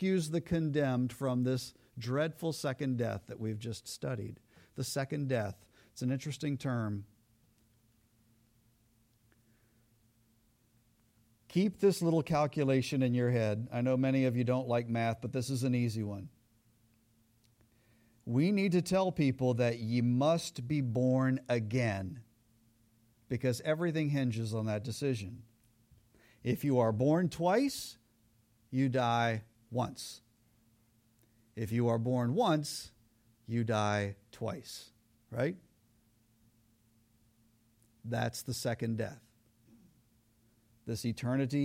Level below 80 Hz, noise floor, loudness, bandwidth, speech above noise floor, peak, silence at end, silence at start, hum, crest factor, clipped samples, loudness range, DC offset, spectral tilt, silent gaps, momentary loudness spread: -68 dBFS; -70 dBFS; -33 LUFS; 16 kHz; 38 dB; -16 dBFS; 0 s; 0 s; none; 18 dB; under 0.1%; 9 LU; under 0.1%; -6.5 dB/octave; none; 13 LU